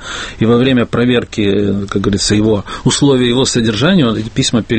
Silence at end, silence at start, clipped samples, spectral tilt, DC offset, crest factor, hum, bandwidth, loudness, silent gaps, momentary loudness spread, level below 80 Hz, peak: 0 s; 0 s; under 0.1%; -5 dB/octave; under 0.1%; 12 dB; none; 8.8 kHz; -13 LUFS; none; 5 LU; -34 dBFS; 0 dBFS